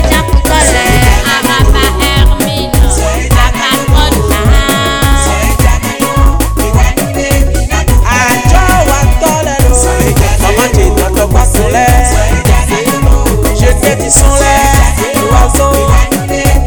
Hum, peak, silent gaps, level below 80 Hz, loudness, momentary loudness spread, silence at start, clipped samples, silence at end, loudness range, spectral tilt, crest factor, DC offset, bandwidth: none; 0 dBFS; none; -10 dBFS; -9 LUFS; 4 LU; 0 s; 5%; 0 s; 2 LU; -4.5 dB/octave; 8 dB; 2%; over 20 kHz